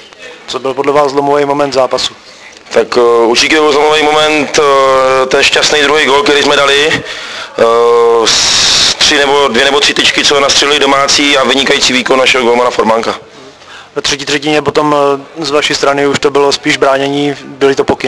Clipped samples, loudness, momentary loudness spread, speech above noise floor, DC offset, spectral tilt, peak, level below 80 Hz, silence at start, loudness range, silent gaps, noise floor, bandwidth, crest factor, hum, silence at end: 0.9%; -8 LUFS; 8 LU; 24 dB; 0.5%; -2 dB/octave; 0 dBFS; -42 dBFS; 0 s; 5 LU; none; -33 dBFS; 11 kHz; 10 dB; none; 0 s